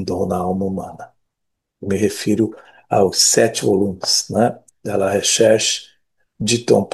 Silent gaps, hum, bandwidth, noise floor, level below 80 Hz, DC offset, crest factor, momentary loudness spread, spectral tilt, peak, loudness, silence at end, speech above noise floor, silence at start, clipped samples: none; none; 12.5 kHz; -77 dBFS; -58 dBFS; under 0.1%; 18 dB; 12 LU; -3.5 dB/octave; 0 dBFS; -17 LUFS; 0.05 s; 59 dB; 0 s; under 0.1%